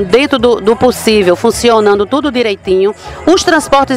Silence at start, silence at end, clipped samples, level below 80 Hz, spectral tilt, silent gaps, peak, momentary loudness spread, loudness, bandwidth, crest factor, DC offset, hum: 0 s; 0 s; 0.4%; -36 dBFS; -4 dB/octave; none; 0 dBFS; 4 LU; -10 LUFS; 16 kHz; 10 dB; under 0.1%; none